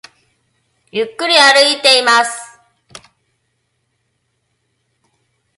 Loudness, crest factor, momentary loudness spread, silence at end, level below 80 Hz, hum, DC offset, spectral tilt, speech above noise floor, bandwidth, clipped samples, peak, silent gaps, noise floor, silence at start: -10 LUFS; 18 dB; 15 LU; 3.1 s; -70 dBFS; none; under 0.1%; 0 dB/octave; 55 dB; 16 kHz; under 0.1%; 0 dBFS; none; -67 dBFS; 0.95 s